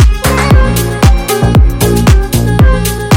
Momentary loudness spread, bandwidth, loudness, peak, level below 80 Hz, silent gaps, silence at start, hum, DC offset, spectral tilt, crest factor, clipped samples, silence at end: 3 LU; 17 kHz; -9 LUFS; 0 dBFS; -10 dBFS; none; 0 s; none; under 0.1%; -5.5 dB/octave; 8 dB; 5%; 0 s